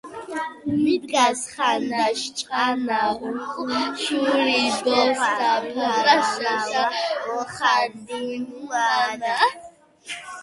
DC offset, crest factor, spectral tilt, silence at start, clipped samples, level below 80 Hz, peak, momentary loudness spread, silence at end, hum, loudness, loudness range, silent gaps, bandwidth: under 0.1%; 18 dB; -2.5 dB/octave; 0.05 s; under 0.1%; -64 dBFS; -4 dBFS; 11 LU; 0 s; none; -22 LUFS; 3 LU; none; 11.5 kHz